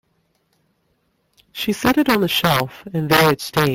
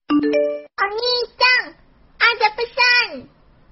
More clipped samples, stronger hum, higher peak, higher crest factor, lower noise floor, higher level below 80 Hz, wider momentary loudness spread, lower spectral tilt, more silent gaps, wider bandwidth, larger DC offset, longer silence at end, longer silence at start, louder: neither; neither; about the same, 0 dBFS vs 0 dBFS; about the same, 18 dB vs 20 dB; first, -66 dBFS vs -49 dBFS; first, -48 dBFS vs -54 dBFS; about the same, 11 LU vs 10 LU; first, -5 dB/octave vs 1.5 dB/octave; neither; first, 17 kHz vs 6 kHz; neither; second, 0 s vs 0.45 s; first, 1.55 s vs 0.1 s; about the same, -17 LUFS vs -17 LUFS